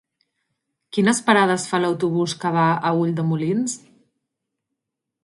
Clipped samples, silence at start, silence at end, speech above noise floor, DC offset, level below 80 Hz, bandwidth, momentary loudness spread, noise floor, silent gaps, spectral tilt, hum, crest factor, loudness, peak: under 0.1%; 0.95 s; 1.45 s; 63 dB; under 0.1%; -68 dBFS; 11.5 kHz; 7 LU; -82 dBFS; none; -5 dB/octave; none; 20 dB; -20 LUFS; -2 dBFS